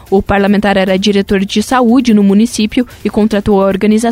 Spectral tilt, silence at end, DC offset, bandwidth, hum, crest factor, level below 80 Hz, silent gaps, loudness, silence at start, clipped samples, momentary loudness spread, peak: -5.5 dB/octave; 0 s; under 0.1%; 15 kHz; none; 10 dB; -34 dBFS; none; -11 LUFS; 0.1 s; under 0.1%; 5 LU; 0 dBFS